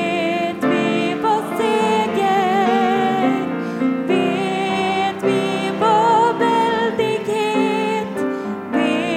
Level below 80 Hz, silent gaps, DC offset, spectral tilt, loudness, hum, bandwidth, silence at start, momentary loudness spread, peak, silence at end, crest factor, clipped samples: -64 dBFS; none; under 0.1%; -5.5 dB/octave; -18 LUFS; none; 16 kHz; 0 s; 6 LU; -4 dBFS; 0 s; 14 dB; under 0.1%